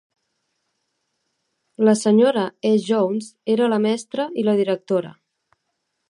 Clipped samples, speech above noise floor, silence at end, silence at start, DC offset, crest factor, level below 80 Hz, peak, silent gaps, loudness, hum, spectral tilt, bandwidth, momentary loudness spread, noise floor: under 0.1%; 56 dB; 1 s; 1.8 s; under 0.1%; 18 dB; -74 dBFS; -4 dBFS; none; -20 LUFS; none; -6 dB/octave; 11 kHz; 8 LU; -75 dBFS